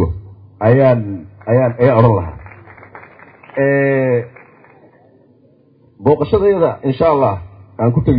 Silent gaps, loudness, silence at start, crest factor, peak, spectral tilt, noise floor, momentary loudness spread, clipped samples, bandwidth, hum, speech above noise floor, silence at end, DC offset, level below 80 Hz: none; -14 LUFS; 0 s; 16 dB; 0 dBFS; -13.5 dB/octave; -50 dBFS; 16 LU; under 0.1%; 5 kHz; none; 38 dB; 0 s; under 0.1%; -36 dBFS